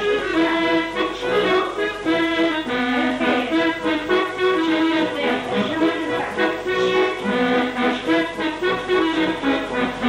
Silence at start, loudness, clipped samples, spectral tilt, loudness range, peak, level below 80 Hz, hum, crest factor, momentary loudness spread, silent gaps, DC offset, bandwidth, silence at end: 0 s; -20 LUFS; under 0.1%; -5 dB/octave; 1 LU; -6 dBFS; -50 dBFS; none; 14 dB; 4 LU; none; under 0.1%; 11.5 kHz; 0 s